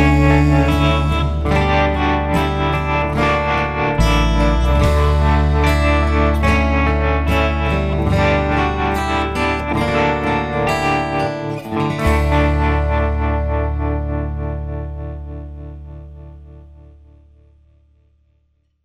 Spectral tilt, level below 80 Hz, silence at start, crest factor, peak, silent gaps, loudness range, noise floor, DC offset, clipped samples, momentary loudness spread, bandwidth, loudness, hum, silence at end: -7 dB/octave; -20 dBFS; 0 s; 16 dB; -2 dBFS; none; 11 LU; -62 dBFS; under 0.1%; under 0.1%; 10 LU; 12.5 kHz; -17 LUFS; none; 2 s